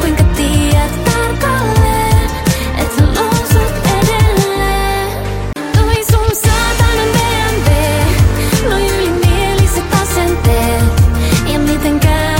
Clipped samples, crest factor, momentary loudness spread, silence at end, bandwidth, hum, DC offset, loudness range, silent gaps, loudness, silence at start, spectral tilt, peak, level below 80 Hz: under 0.1%; 12 dB; 3 LU; 0 s; 17 kHz; none; under 0.1%; 1 LU; none; -12 LUFS; 0 s; -5 dB/octave; 0 dBFS; -18 dBFS